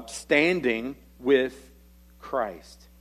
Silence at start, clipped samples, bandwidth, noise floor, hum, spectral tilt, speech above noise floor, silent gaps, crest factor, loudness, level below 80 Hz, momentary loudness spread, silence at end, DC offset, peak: 0 s; under 0.1%; 14 kHz; -53 dBFS; none; -4.5 dB/octave; 27 dB; none; 20 dB; -25 LUFS; -54 dBFS; 12 LU; 0.25 s; under 0.1%; -8 dBFS